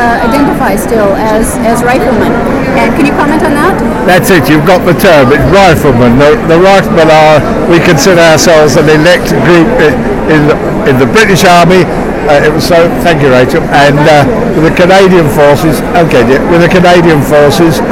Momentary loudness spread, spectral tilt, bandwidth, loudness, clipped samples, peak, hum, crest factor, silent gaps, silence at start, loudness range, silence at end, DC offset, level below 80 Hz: 5 LU; -5.5 dB/octave; 17 kHz; -5 LUFS; 7%; 0 dBFS; none; 4 dB; none; 0 s; 3 LU; 0 s; 0.4%; -24 dBFS